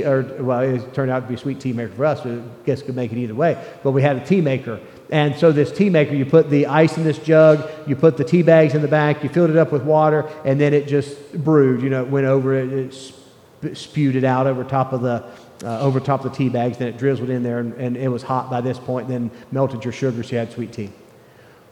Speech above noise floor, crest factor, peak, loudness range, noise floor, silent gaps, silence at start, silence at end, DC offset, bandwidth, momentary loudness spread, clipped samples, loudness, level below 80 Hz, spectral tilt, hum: 29 dB; 18 dB; -2 dBFS; 8 LU; -47 dBFS; none; 0 s; 0.8 s; under 0.1%; 10.5 kHz; 11 LU; under 0.1%; -19 LUFS; -64 dBFS; -8 dB/octave; none